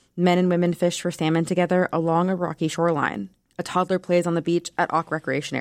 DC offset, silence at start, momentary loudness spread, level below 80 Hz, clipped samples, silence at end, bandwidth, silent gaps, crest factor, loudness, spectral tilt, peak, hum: under 0.1%; 0.15 s; 6 LU; -64 dBFS; under 0.1%; 0 s; 12.5 kHz; none; 14 dB; -23 LUFS; -6 dB/octave; -8 dBFS; none